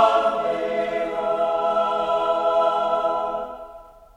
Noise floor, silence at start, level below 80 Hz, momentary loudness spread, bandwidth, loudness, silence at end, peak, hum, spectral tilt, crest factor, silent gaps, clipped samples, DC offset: -44 dBFS; 0 s; -56 dBFS; 9 LU; 9.4 kHz; -22 LUFS; 0.25 s; -6 dBFS; none; -4.5 dB/octave; 16 dB; none; under 0.1%; under 0.1%